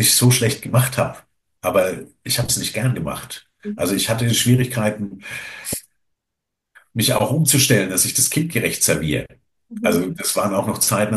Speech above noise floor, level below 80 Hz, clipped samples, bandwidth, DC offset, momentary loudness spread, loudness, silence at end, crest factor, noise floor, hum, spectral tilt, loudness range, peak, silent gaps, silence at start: 62 dB; -48 dBFS; under 0.1%; 13 kHz; under 0.1%; 14 LU; -18 LUFS; 0 s; 18 dB; -81 dBFS; none; -3.5 dB/octave; 4 LU; -2 dBFS; none; 0 s